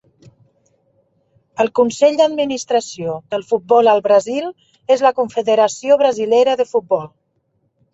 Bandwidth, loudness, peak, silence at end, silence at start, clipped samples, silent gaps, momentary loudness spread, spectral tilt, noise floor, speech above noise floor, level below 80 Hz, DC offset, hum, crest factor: 8 kHz; -16 LUFS; -2 dBFS; 0.85 s; 1.6 s; under 0.1%; none; 12 LU; -4 dB/octave; -65 dBFS; 50 dB; -64 dBFS; under 0.1%; none; 16 dB